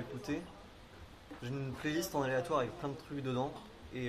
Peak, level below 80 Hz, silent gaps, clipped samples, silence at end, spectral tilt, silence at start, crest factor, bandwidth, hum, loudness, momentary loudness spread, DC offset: -20 dBFS; -60 dBFS; none; under 0.1%; 0 s; -5.5 dB/octave; 0 s; 20 dB; 15 kHz; none; -38 LUFS; 20 LU; under 0.1%